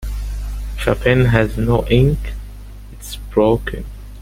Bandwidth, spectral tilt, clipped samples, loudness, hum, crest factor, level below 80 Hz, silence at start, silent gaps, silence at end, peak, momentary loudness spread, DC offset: 16.5 kHz; -7 dB/octave; under 0.1%; -17 LUFS; 50 Hz at -25 dBFS; 18 dB; -26 dBFS; 0 s; none; 0 s; 0 dBFS; 20 LU; under 0.1%